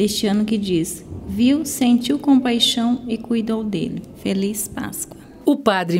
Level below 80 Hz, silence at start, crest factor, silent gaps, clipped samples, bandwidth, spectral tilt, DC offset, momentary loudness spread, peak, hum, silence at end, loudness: -48 dBFS; 0 s; 18 dB; none; under 0.1%; 16 kHz; -4.5 dB/octave; under 0.1%; 11 LU; 0 dBFS; none; 0 s; -20 LUFS